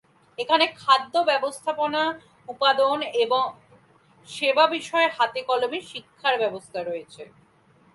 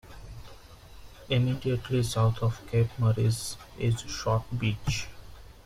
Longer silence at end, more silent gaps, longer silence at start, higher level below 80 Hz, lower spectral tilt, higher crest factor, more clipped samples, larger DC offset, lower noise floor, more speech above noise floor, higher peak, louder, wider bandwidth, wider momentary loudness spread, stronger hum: first, 0.7 s vs 0.15 s; neither; first, 0.4 s vs 0.05 s; second, -74 dBFS vs -48 dBFS; second, -2.5 dB/octave vs -6 dB/octave; first, 22 dB vs 16 dB; neither; neither; first, -58 dBFS vs -48 dBFS; first, 35 dB vs 21 dB; first, -2 dBFS vs -14 dBFS; first, -23 LUFS vs -29 LUFS; second, 11.5 kHz vs 14.5 kHz; about the same, 15 LU vs 15 LU; neither